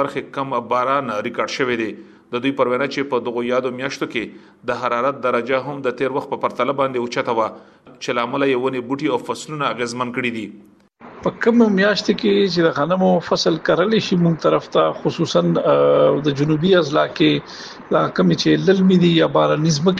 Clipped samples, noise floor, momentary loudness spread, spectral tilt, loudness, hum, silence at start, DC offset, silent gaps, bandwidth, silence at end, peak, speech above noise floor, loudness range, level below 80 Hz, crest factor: under 0.1%; -42 dBFS; 10 LU; -6 dB/octave; -18 LUFS; none; 0 s; under 0.1%; none; 10 kHz; 0 s; -2 dBFS; 24 dB; 5 LU; -58 dBFS; 16 dB